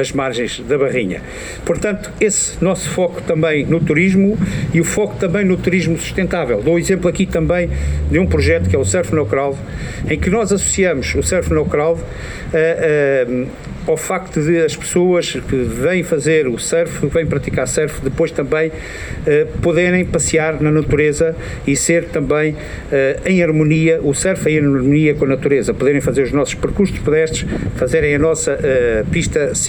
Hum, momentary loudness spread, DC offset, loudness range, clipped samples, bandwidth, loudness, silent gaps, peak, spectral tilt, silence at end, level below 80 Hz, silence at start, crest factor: none; 6 LU; 0.1%; 2 LU; under 0.1%; over 20 kHz; -16 LUFS; none; -2 dBFS; -5.5 dB/octave; 0 s; -30 dBFS; 0 s; 14 dB